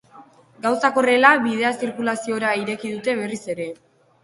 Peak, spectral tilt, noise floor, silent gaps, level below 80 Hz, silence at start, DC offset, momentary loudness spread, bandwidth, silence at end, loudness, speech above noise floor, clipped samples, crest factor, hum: 0 dBFS; -4 dB/octave; -48 dBFS; none; -68 dBFS; 0.15 s; under 0.1%; 14 LU; 11.5 kHz; 0.5 s; -20 LUFS; 28 dB; under 0.1%; 22 dB; none